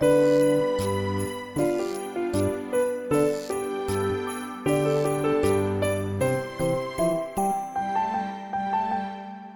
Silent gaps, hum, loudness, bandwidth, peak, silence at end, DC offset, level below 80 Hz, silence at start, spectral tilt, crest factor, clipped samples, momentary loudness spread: none; none; -26 LUFS; 19 kHz; -10 dBFS; 0 s; under 0.1%; -52 dBFS; 0 s; -6 dB/octave; 16 dB; under 0.1%; 7 LU